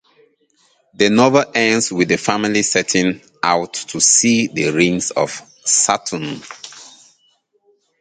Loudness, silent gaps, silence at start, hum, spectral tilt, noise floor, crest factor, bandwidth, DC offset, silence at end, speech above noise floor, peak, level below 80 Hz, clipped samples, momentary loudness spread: -15 LUFS; none; 1 s; none; -3 dB/octave; -61 dBFS; 18 dB; 9.6 kHz; under 0.1%; 1.15 s; 44 dB; 0 dBFS; -56 dBFS; under 0.1%; 13 LU